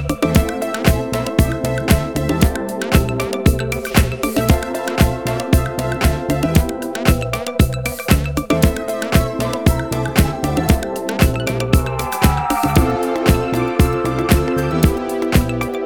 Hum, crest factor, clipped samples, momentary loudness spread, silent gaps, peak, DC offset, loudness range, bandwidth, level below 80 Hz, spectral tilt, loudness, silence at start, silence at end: none; 16 dB; under 0.1%; 4 LU; none; -2 dBFS; 0.6%; 1 LU; 20 kHz; -24 dBFS; -5.5 dB/octave; -17 LUFS; 0 s; 0 s